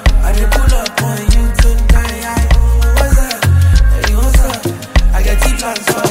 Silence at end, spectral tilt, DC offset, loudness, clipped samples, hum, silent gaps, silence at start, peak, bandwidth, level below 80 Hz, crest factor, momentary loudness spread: 0 s; -5 dB/octave; under 0.1%; -13 LUFS; under 0.1%; none; none; 0 s; 0 dBFS; 16.5 kHz; -10 dBFS; 10 dB; 5 LU